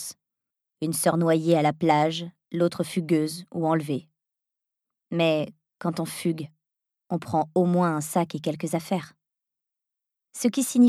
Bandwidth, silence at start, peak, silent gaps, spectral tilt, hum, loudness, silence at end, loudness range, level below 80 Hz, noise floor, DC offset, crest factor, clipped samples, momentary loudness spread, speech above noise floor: 14.5 kHz; 0 s; -6 dBFS; none; -5.5 dB/octave; none; -26 LUFS; 0 s; 5 LU; -74 dBFS; -87 dBFS; under 0.1%; 20 dB; under 0.1%; 11 LU; 63 dB